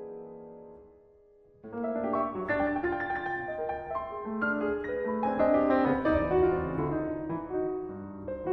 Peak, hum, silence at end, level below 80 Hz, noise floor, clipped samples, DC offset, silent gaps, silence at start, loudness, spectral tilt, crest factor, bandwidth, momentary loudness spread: -14 dBFS; none; 0 s; -52 dBFS; -59 dBFS; under 0.1%; under 0.1%; none; 0 s; -30 LUFS; -9.5 dB/octave; 16 dB; 5.8 kHz; 15 LU